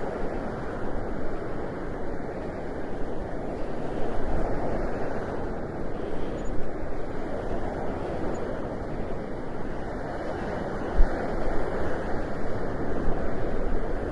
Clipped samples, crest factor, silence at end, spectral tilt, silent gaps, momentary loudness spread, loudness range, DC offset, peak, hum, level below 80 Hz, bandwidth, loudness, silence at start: under 0.1%; 20 dB; 0 s; -7.5 dB/octave; none; 4 LU; 3 LU; under 0.1%; -6 dBFS; none; -32 dBFS; 7.2 kHz; -32 LUFS; 0 s